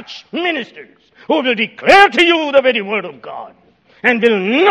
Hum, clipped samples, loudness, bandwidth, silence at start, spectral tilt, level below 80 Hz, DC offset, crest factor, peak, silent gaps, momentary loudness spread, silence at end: none; 0.2%; -13 LUFS; 12.5 kHz; 0 s; -4 dB/octave; -54 dBFS; under 0.1%; 14 dB; 0 dBFS; none; 21 LU; 0 s